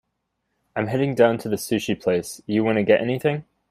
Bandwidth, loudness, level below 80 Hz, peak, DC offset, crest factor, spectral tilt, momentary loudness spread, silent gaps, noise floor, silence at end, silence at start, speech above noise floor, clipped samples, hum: 15.5 kHz; -22 LUFS; -60 dBFS; -4 dBFS; under 0.1%; 18 dB; -6 dB/octave; 8 LU; none; -76 dBFS; 0.3 s; 0.75 s; 55 dB; under 0.1%; none